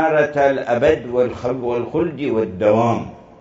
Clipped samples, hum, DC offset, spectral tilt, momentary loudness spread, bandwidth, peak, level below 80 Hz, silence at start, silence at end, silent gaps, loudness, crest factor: under 0.1%; none; under 0.1%; -7.5 dB/octave; 6 LU; 7.8 kHz; -2 dBFS; -48 dBFS; 0 s; 0.2 s; none; -18 LUFS; 16 dB